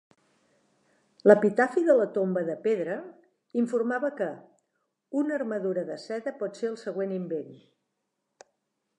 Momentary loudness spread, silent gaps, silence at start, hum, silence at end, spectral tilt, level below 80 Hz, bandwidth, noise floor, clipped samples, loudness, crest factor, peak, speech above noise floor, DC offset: 14 LU; none; 1.25 s; none; 1.4 s; -7 dB/octave; -86 dBFS; 11 kHz; -81 dBFS; under 0.1%; -27 LUFS; 26 dB; -4 dBFS; 54 dB; under 0.1%